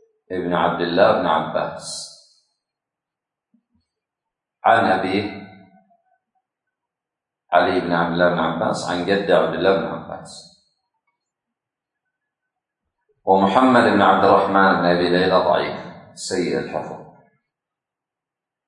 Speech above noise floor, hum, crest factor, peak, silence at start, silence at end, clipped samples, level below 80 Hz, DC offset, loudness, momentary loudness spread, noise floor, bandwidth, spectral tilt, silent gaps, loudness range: 69 dB; none; 20 dB; 0 dBFS; 0.3 s; 1.65 s; under 0.1%; -62 dBFS; under 0.1%; -18 LUFS; 17 LU; -86 dBFS; 11 kHz; -5.5 dB/octave; none; 10 LU